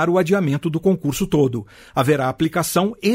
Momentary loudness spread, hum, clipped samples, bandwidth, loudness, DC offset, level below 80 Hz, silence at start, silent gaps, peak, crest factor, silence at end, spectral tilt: 4 LU; none; under 0.1%; 16 kHz; -19 LUFS; under 0.1%; -48 dBFS; 0 s; none; -4 dBFS; 14 dB; 0 s; -6 dB/octave